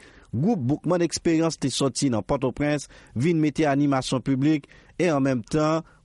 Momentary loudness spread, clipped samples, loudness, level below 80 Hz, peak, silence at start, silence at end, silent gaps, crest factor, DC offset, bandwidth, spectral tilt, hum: 5 LU; under 0.1%; -24 LUFS; -50 dBFS; -10 dBFS; 0.35 s; 0.2 s; none; 14 dB; under 0.1%; 11.5 kHz; -5.5 dB/octave; none